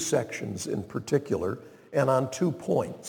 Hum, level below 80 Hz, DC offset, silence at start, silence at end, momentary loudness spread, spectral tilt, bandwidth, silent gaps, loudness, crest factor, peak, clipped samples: none; -62 dBFS; under 0.1%; 0 s; 0 s; 9 LU; -5.5 dB/octave; 19 kHz; none; -29 LUFS; 18 dB; -10 dBFS; under 0.1%